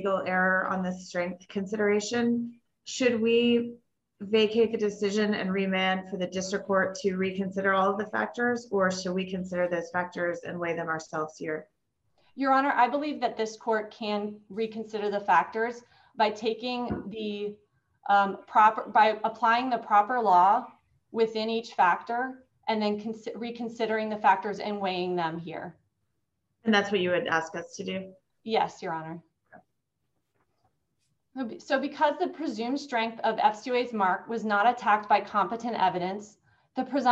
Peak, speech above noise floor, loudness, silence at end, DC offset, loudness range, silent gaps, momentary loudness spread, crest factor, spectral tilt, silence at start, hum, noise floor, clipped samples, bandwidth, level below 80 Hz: -8 dBFS; 53 dB; -28 LUFS; 0 s; under 0.1%; 7 LU; none; 13 LU; 20 dB; -5 dB/octave; 0 s; none; -81 dBFS; under 0.1%; 8.4 kHz; -70 dBFS